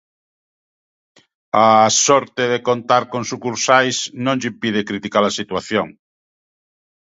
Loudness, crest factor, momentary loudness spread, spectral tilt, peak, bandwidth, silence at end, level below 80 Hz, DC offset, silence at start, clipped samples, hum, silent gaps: -17 LUFS; 18 dB; 11 LU; -3 dB/octave; 0 dBFS; 8 kHz; 1.15 s; -60 dBFS; under 0.1%; 1.55 s; under 0.1%; none; none